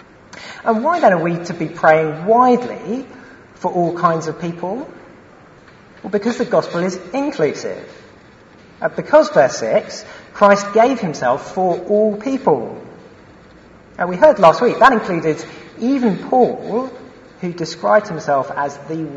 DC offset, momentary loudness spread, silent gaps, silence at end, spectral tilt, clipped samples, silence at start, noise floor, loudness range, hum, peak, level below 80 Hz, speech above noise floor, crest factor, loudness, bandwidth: under 0.1%; 16 LU; none; 0 s; -6 dB/octave; under 0.1%; 0.35 s; -44 dBFS; 7 LU; none; 0 dBFS; -56 dBFS; 28 dB; 18 dB; -16 LUFS; 8 kHz